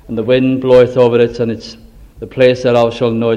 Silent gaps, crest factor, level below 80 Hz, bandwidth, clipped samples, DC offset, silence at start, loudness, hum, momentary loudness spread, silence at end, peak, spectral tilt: none; 12 dB; -42 dBFS; 7.8 kHz; 0.2%; under 0.1%; 0.1 s; -12 LUFS; none; 17 LU; 0 s; 0 dBFS; -7 dB/octave